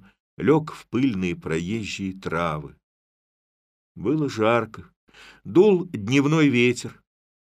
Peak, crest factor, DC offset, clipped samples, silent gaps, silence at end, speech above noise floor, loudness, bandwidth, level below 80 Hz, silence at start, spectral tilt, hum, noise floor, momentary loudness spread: -6 dBFS; 18 dB; under 0.1%; under 0.1%; 2.83-3.95 s, 4.96-5.07 s; 0.55 s; over 68 dB; -23 LUFS; 12 kHz; -56 dBFS; 0.4 s; -6.5 dB/octave; none; under -90 dBFS; 12 LU